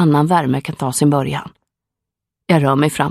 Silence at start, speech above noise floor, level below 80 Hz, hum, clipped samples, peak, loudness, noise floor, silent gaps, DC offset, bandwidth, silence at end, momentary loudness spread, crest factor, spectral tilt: 0 s; 67 dB; -52 dBFS; none; under 0.1%; 0 dBFS; -16 LUFS; -83 dBFS; none; under 0.1%; 14.5 kHz; 0 s; 10 LU; 16 dB; -6 dB/octave